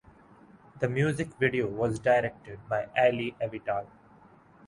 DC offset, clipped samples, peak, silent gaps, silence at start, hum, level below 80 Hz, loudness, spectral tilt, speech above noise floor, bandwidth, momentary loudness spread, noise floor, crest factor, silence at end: under 0.1%; under 0.1%; -10 dBFS; none; 0.75 s; none; -60 dBFS; -29 LUFS; -6.5 dB/octave; 28 dB; 11.5 kHz; 10 LU; -56 dBFS; 20 dB; 0.8 s